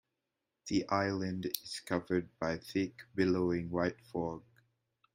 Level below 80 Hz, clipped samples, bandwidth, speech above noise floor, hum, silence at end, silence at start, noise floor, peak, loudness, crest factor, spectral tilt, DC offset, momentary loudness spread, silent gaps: -68 dBFS; under 0.1%; 16 kHz; 53 dB; none; 0.75 s; 0.65 s; -87 dBFS; -12 dBFS; -35 LUFS; 24 dB; -5.5 dB/octave; under 0.1%; 7 LU; none